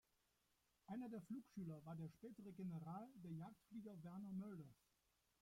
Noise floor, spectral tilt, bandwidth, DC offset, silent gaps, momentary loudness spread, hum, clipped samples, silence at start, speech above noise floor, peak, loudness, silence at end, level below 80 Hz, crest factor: -85 dBFS; -8.5 dB/octave; 16.5 kHz; under 0.1%; none; 6 LU; none; under 0.1%; 0.9 s; 31 dB; -42 dBFS; -55 LUFS; 0.7 s; -86 dBFS; 14 dB